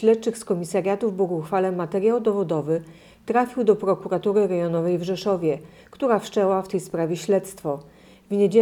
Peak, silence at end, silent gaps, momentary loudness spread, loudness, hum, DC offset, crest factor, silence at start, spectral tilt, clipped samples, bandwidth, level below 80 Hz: -6 dBFS; 0 s; none; 7 LU; -23 LUFS; none; under 0.1%; 16 dB; 0 s; -6.5 dB/octave; under 0.1%; 13.5 kHz; -62 dBFS